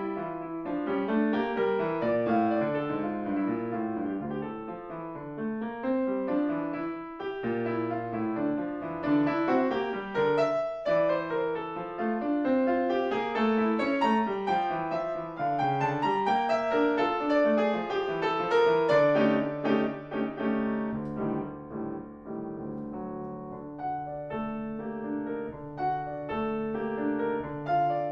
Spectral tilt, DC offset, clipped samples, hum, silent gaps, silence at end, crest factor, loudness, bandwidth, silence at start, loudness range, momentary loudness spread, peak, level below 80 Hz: -7.5 dB/octave; under 0.1%; under 0.1%; none; none; 0 s; 16 dB; -29 LUFS; 7.6 kHz; 0 s; 9 LU; 11 LU; -12 dBFS; -60 dBFS